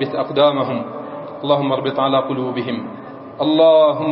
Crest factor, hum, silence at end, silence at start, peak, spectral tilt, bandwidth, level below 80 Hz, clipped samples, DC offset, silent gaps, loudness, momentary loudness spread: 18 dB; none; 0 s; 0 s; 0 dBFS; -11 dB/octave; 5.6 kHz; -64 dBFS; under 0.1%; under 0.1%; none; -17 LUFS; 18 LU